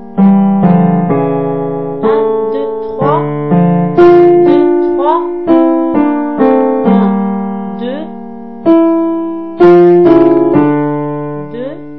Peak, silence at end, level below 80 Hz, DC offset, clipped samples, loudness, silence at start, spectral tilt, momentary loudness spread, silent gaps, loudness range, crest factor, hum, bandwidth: 0 dBFS; 0 s; -46 dBFS; 2%; 0.8%; -10 LUFS; 0 s; -11 dB/octave; 14 LU; none; 3 LU; 10 dB; none; 4.8 kHz